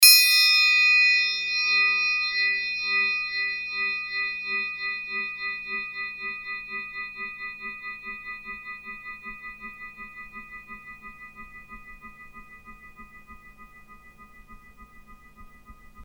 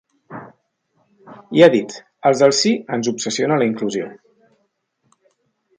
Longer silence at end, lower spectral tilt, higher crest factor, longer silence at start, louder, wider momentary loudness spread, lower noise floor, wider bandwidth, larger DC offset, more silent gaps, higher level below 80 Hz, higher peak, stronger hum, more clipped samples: second, 0 s vs 1.65 s; second, 2.5 dB/octave vs -4.5 dB/octave; first, 26 dB vs 20 dB; second, 0 s vs 0.3 s; second, -22 LUFS vs -17 LUFS; about the same, 26 LU vs 24 LU; second, -49 dBFS vs -68 dBFS; first, over 20 kHz vs 9.6 kHz; neither; neither; first, -56 dBFS vs -68 dBFS; about the same, 0 dBFS vs 0 dBFS; neither; neither